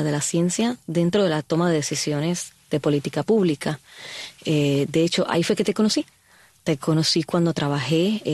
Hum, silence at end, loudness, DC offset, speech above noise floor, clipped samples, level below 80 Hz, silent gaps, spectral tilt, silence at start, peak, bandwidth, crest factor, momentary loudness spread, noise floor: none; 0 s; -22 LUFS; under 0.1%; 34 dB; under 0.1%; -60 dBFS; none; -5 dB/octave; 0 s; -8 dBFS; 12.5 kHz; 16 dB; 9 LU; -55 dBFS